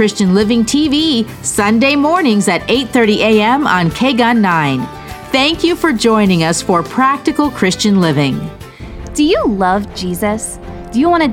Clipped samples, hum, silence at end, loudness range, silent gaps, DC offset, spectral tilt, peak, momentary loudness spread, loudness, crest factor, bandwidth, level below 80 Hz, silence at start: under 0.1%; none; 0 s; 3 LU; none; under 0.1%; -4.5 dB/octave; 0 dBFS; 10 LU; -13 LUFS; 12 dB; 16.5 kHz; -36 dBFS; 0 s